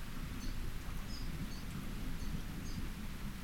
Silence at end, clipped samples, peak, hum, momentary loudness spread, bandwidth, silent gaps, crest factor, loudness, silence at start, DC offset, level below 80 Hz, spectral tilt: 0 s; under 0.1%; -28 dBFS; none; 2 LU; 17 kHz; none; 12 dB; -45 LUFS; 0 s; 0.2%; -42 dBFS; -5 dB/octave